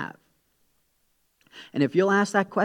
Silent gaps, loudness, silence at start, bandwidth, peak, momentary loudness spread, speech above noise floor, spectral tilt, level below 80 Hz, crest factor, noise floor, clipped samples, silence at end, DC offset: none; -23 LUFS; 0 s; 12.5 kHz; -6 dBFS; 16 LU; 47 dB; -6 dB/octave; -76 dBFS; 20 dB; -70 dBFS; under 0.1%; 0 s; under 0.1%